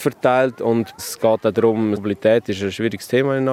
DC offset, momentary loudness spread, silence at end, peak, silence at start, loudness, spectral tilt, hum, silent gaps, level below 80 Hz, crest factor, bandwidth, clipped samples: under 0.1%; 5 LU; 0 s; -2 dBFS; 0 s; -19 LUFS; -6 dB/octave; none; none; -64 dBFS; 16 dB; 16 kHz; under 0.1%